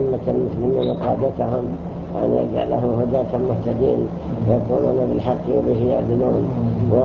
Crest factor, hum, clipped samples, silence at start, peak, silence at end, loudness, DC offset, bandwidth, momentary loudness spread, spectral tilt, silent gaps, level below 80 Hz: 16 dB; none; under 0.1%; 0 s; -4 dBFS; 0 s; -20 LUFS; under 0.1%; 6.4 kHz; 4 LU; -10.5 dB/octave; none; -40 dBFS